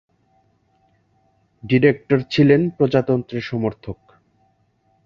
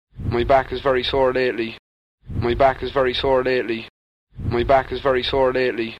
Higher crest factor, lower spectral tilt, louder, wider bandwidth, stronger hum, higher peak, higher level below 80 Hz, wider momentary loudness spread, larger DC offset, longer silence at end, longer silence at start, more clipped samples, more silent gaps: about the same, 20 dB vs 16 dB; first, -8.5 dB/octave vs -7 dB/octave; about the same, -18 LUFS vs -20 LUFS; second, 7 kHz vs 9.2 kHz; neither; about the same, -2 dBFS vs -4 dBFS; second, -54 dBFS vs -38 dBFS; first, 20 LU vs 9 LU; neither; first, 1.1 s vs 0 s; first, 1.65 s vs 0.15 s; neither; second, none vs 1.79-2.18 s, 3.90-4.27 s